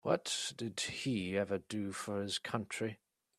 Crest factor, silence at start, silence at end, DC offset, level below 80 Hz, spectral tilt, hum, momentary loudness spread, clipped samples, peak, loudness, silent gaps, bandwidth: 22 dB; 0.05 s; 0.45 s; under 0.1%; -74 dBFS; -4 dB/octave; none; 6 LU; under 0.1%; -16 dBFS; -38 LUFS; none; 14 kHz